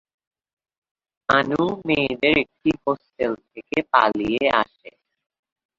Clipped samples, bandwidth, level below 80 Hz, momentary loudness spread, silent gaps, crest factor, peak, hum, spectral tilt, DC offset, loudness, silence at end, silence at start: under 0.1%; 7.6 kHz; -54 dBFS; 8 LU; none; 22 dB; -2 dBFS; none; -6 dB/octave; under 0.1%; -21 LUFS; 0.9 s; 1.3 s